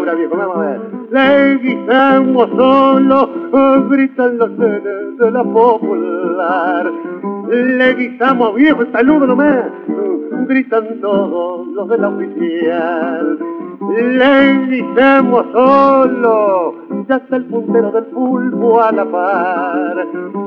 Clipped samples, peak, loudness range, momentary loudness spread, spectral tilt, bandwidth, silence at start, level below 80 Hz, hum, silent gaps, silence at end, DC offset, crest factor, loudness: under 0.1%; 0 dBFS; 5 LU; 10 LU; -8 dB/octave; 5.2 kHz; 0 s; -56 dBFS; none; none; 0 s; under 0.1%; 12 dB; -13 LUFS